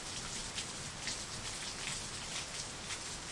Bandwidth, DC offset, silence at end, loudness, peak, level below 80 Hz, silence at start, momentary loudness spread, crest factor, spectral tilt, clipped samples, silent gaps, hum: 11.5 kHz; under 0.1%; 0 s; -40 LUFS; -24 dBFS; -56 dBFS; 0 s; 2 LU; 20 dB; -1.5 dB/octave; under 0.1%; none; none